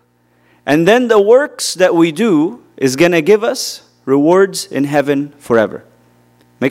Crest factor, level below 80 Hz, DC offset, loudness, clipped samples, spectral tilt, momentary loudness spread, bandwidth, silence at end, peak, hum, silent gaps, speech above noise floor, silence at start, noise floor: 14 dB; -58 dBFS; under 0.1%; -13 LUFS; under 0.1%; -5 dB/octave; 10 LU; 16 kHz; 0 s; 0 dBFS; 60 Hz at -50 dBFS; none; 43 dB; 0.65 s; -55 dBFS